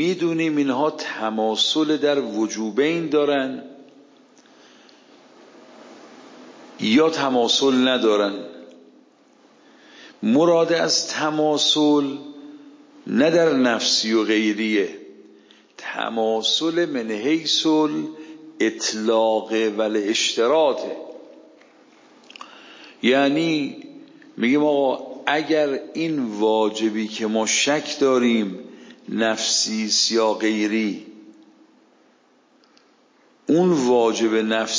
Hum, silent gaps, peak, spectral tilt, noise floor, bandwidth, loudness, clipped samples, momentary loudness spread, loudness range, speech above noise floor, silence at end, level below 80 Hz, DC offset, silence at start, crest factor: none; none; -4 dBFS; -3.5 dB/octave; -58 dBFS; 7.6 kHz; -20 LUFS; under 0.1%; 13 LU; 5 LU; 38 dB; 0 s; -76 dBFS; under 0.1%; 0 s; 18 dB